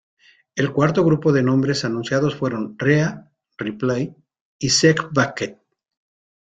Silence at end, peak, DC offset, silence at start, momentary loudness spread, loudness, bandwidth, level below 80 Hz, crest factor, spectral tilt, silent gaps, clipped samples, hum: 0.95 s; -2 dBFS; under 0.1%; 0.55 s; 14 LU; -20 LUFS; 9.4 kHz; -56 dBFS; 18 dB; -5 dB/octave; 4.41-4.59 s; under 0.1%; none